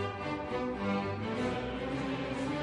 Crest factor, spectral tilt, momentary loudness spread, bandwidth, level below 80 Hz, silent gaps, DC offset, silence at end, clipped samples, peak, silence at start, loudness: 12 dB; -6.5 dB/octave; 3 LU; 11 kHz; -52 dBFS; none; under 0.1%; 0 s; under 0.1%; -22 dBFS; 0 s; -35 LUFS